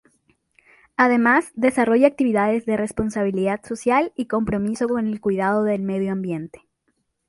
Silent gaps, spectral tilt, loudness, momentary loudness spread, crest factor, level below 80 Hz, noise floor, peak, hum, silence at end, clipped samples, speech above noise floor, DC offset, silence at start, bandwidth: none; -6.5 dB/octave; -21 LUFS; 8 LU; 18 dB; -52 dBFS; -71 dBFS; -2 dBFS; none; 0.75 s; under 0.1%; 51 dB; under 0.1%; 1 s; 11.5 kHz